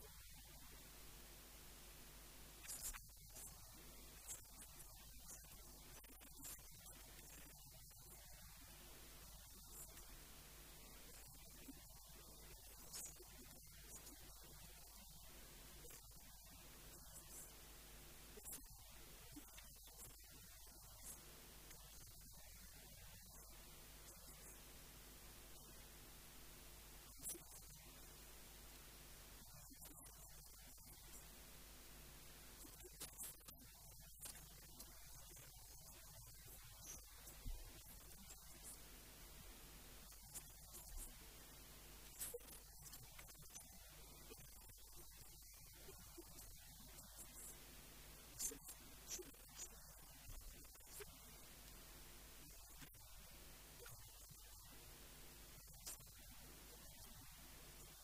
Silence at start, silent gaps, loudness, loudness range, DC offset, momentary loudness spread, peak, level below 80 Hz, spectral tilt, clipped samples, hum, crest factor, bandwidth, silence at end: 0 s; none; -58 LUFS; 5 LU; under 0.1%; 6 LU; -32 dBFS; -66 dBFS; -2 dB/octave; under 0.1%; none; 26 dB; 15.5 kHz; 0 s